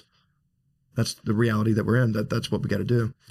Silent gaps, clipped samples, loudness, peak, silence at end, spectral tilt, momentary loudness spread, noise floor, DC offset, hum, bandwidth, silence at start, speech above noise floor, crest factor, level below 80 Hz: none; under 0.1%; -25 LUFS; -10 dBFS; 0.2 s; -6.5 dB/octave; 6 LU; -70 dBFS; under 0.1%; none; 14 kHz; 0.95 s; 46 dB; 14 dB; -54 dBFS